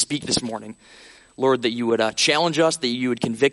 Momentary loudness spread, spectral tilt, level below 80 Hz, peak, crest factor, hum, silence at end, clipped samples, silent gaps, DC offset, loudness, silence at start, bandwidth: 8 LU; -3.5 dB/octave; -58 dBFS; -4 dBFS; 18 dB; none; 0 s; under 0.1%; none; under 0.1%; -21 LUFS; 0 s; 11.5 kHz